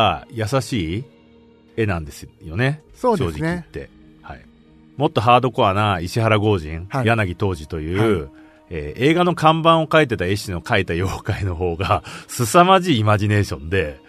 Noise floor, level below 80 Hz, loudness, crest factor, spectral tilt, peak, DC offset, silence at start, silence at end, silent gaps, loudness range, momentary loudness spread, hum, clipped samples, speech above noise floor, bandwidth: -50 dBFS; -42 dBFS; -19 LUFS; 20 dB; -6 dB/octave; 0 dBFS; under 0.1%; 0 s; 0.15 s; none; 6 LU; 15 LU; none; under 0.1%; 31 dB; 13.5 kHz